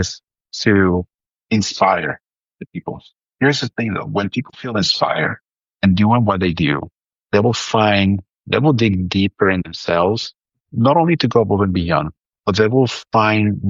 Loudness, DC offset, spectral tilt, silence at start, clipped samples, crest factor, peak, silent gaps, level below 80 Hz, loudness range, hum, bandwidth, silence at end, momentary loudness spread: -17 LUFS; under 0.1%; -6 dB/octave; 0 s; under 0.1%; 16 dB; -2 dBFS; none; -46 dBFS; 4 LU; none; 7.6 kHz; 0 s; 15 LU